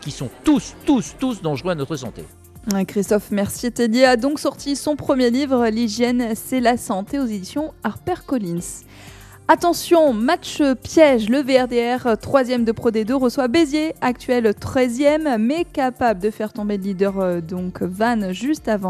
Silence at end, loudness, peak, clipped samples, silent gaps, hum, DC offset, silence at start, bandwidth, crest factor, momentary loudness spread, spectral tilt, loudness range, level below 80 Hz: 0 s; -19 LUFS; 0 dBFS; under 0.1%; none; none; under 0.1%; 0 s; 14 kHz; 18 dB; 10 LU; -5 dB/octave; 5 LU; -46 dBFS